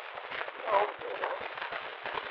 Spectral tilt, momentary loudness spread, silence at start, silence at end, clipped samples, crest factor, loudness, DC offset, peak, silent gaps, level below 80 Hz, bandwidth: 1 dB/octave; 8 LU; 0 s; 0 s; under 0.1%; 22 dB; -34 LUFS; under 0.1%; -12 dBFS; none; -72 dBFS; 6.2 kHz